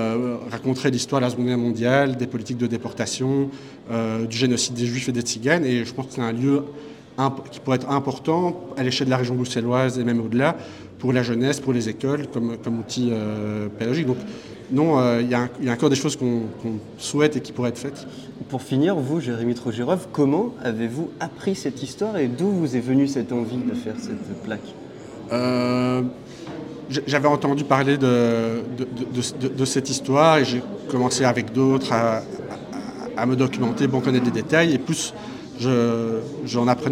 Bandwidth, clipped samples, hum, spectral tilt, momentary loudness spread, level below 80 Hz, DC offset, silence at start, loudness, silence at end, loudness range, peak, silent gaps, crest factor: 14 kHz; under 0.1%; none; -5.5 dB/octave; 12 LU; -60 dBFS; under 0.1%; 0 s; -23 LUFS; 0 s; 4 LU; -2 dBFS; none; 20 dB